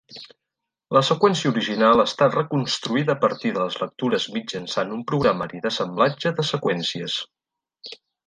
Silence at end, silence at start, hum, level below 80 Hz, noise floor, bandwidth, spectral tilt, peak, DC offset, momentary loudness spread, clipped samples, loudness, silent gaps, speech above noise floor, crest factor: 0.35 s; 0.1 s; none; -60 dBFS; -84 dBFS; 9.8 kHz; -5 dB/octave; -2 dBFS; under 0.1%; 12 LU; under 0.1%; -22 LUFS; none; 62 dB; 20 dB